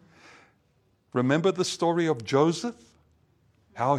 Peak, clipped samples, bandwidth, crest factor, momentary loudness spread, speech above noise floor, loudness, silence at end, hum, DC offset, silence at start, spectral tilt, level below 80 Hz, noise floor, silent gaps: -8 dBFS; under 0.1%; 13 kHz; 20 dB; 9 LU; 43 dB; -26 LUFS; 0 s; none; under 0.1%; 1.15 s; -5.5 dB/octave; -72 dBFS; -67 dBFS; none